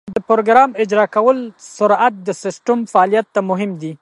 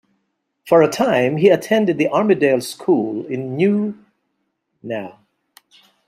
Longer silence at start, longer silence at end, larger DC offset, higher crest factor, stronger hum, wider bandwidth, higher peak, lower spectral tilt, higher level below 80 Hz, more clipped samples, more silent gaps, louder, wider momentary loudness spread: second, 0.05 s vs 0.65 s; second, 0.05 s vs 0.95 s; neither; about the same, 16 dB vs 18 dB; neither; second, 11.5 kHz vs 15 kHz; about the same, 0 dBFS vs -2 dBFS; about the same, -5.5 dB/octave vs -6 dB/octave; about the same, -62 dBFS vs -64 dBFS; neither; neither; about the same, -15 LUFS vs -17 LUFS; second, 11 LU vs 14 LU